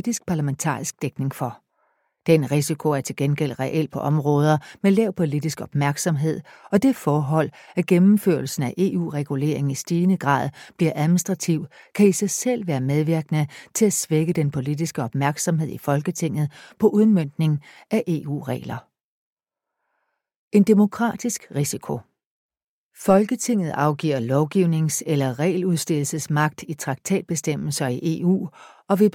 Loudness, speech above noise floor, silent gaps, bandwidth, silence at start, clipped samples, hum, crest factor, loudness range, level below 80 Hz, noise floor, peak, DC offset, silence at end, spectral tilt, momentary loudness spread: -22 LUFS; 64 dB; 19.04-19.37 s, 20.36-20.51 s, 22.26-22.49 s, 22.63-22.91 s; 16.5 kHz; 0.05 s; under 0.1%; none; 18 dB; 3 LU; -62 dBFS; -85 dBFS; -4 dBFS; under 0.1%; 0.05 s; -6 dB/octave; 9 LU